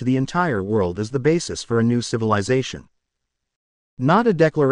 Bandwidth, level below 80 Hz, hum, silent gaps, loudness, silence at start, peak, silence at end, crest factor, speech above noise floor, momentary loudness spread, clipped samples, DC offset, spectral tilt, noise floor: 11 kHz; -52 dBFS; none; 3.56-3.97 s; -20 LUFS; 0 s; -4 dBFS; 0 s; 18 dB; 59 dB; 6 LU; under 0.1%; under 0.1%; -6 dB/octave; -78 dBFS